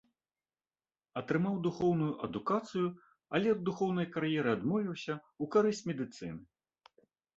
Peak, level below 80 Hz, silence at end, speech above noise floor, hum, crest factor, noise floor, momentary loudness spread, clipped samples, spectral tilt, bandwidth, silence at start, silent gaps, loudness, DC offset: -14 dBFS; -70 dBFS; 0.95 s; over 57 dB; none; 20 dB; under -90 dBFS; 10 LU; under 0.1%; -7 dB/octave; 8 kHz; 1.15 s; none; -34 LUFS; under 0.1%